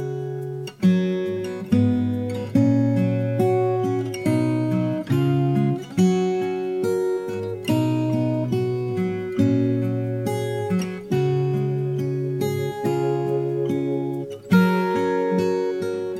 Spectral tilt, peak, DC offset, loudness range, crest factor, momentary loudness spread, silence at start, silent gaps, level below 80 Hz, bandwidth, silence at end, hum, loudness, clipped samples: -8 dB/octave; -6 dBFS; under 0.1%; 2 LU; 16 dB; 6 LU; 0 s; none; -60 dBFS; 15.5 kHz; 0 s; none; -23 LUFS; under 0.1%